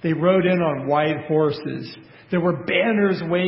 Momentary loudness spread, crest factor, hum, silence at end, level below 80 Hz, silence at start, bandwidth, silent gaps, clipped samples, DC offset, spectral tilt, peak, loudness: 11 LU; 16 dB; none; 0 s; -58 dBFS; 0.05 s; 5.8 kHz; none; under 0.1%; under 0.1%; -11.5 dB/octave; -4 dBFS; -21 LUFS